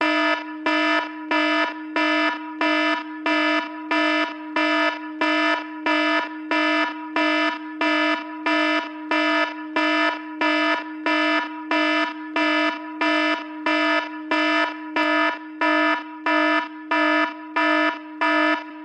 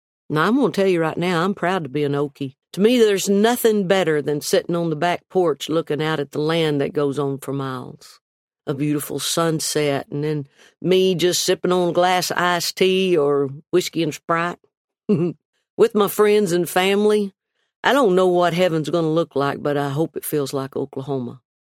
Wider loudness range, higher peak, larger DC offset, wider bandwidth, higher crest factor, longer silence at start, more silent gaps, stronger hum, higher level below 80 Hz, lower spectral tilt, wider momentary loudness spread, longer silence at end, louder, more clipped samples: second, 1 LU vs 5 LU; second, -10 dBFS vs -2 dBFS; neither; second, 8.8 kHz vs 16.5 kHz; second, 12 dB vs 18 dB; second, 0 s vs 0.3 s; second, none vs 8.21-8.48 s, 14.77-14.88 s, 15.45-15.53 s, 15.70-15.77 s, 17.76-17.83 s; neither; second, -76 dBFS vs -66 dBFS; second, -2 dB/octave vs -5 dB/octave; second, 5 LU vs 10 LU; second, 0 s vs 0.35 s; about the same, -21 LUFS vs -20 LUFS; neither